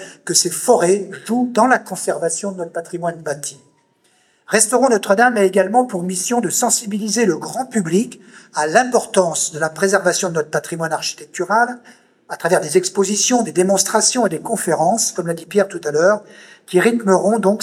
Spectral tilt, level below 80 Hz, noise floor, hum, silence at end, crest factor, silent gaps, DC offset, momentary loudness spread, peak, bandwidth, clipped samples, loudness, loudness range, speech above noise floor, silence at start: -3.5 dB/octave; -68 dBFS; -59 dBFS; none; 0 s; 18 dB; none; under 0.1%; 10 LU; 0 dBFS; 16 kHz; under 0.1%; -17 LUFS; 3 LU; 41 dB; 0 s